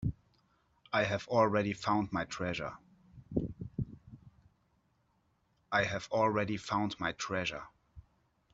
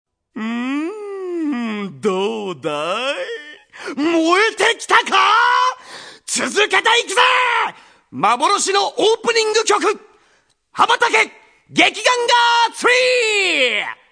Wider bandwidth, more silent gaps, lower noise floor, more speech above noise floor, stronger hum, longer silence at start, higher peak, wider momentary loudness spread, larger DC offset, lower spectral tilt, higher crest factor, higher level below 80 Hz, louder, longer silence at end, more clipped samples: second, 8 kHz vs 10.5 kHz; neither; first, -75 dBFS vs -59 dBFS; about the same, 42 dB vs 43 dB; neither; second, 0 s vs 0.35 s; second, -14 dBFS vs 0 dBFS; about the same, 12 LU vs 14 LU; neither; first, -5.5 dB/octave vs -1.5 dB/octave; about the same, 22 dB vs 18 dB; first, -58 dBFS vs -70 dBFS; second, -34 LUFS vs -16 LUFS; first, 0.55 s vs 0.2 s; neither